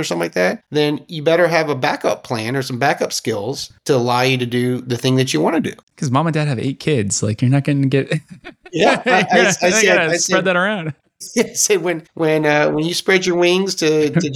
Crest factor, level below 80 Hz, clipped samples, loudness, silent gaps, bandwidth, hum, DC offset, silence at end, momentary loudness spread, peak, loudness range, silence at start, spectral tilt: 16 dB; -58 dBFS; under 0.1%; -17 LUFS; 5.83-5.87 s; 16.5 kHz; none; under 0.1%; 0 s; 9 LU; -2 dBFS; 3 LU; 0 s; -4.5 dB/octave